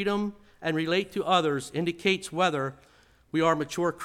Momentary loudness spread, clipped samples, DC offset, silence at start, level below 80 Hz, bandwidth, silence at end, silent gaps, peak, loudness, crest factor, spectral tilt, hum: 8 LU; under 0.1%; under 0.1%; 0 s; -62 dBFS; 16 kHz; 0 s; none; -8 dBFS; -27 LUFS; 20 dB; -5 dB/octave; none